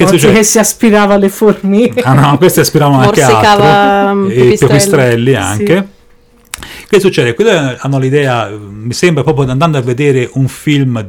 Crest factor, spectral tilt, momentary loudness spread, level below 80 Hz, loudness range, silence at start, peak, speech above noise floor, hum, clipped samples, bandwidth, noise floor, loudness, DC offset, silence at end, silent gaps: 8 dB; -5 dB/octave; 8 LU; -38 dBFS; 5 LU; 0 s; 0 dBFS; 35 dB; none; 1%; 19.5 kHz; -43 dBFS; -8 LUFS; under 0.1%; 0 s; none